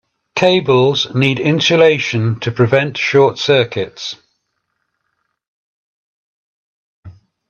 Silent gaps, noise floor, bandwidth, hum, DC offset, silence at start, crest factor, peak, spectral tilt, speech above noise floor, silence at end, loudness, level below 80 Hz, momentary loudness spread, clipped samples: 5.48-7.03 s; -70 dBFS; 7.8 kHz; none; under 0.1%; 0.35 s; 16 dB; 0 dBFS; -5.5 dB/octave; 57 dB; 0.4 s; -14 LUFS; -58 dBFS; 12 LU; under 0.1%